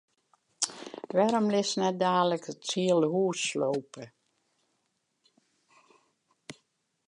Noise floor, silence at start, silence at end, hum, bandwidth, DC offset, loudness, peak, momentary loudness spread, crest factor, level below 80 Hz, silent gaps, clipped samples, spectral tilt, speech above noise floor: -78 dBFS; 0.6 s; 0.55 s; none; 11.5 kHz; under 0.1%; -28 LUFS; -6 dBFS; 22 LU; 24 dB; -82 dBFS; none; under 0.1%; -4 dB/octave; 50 dB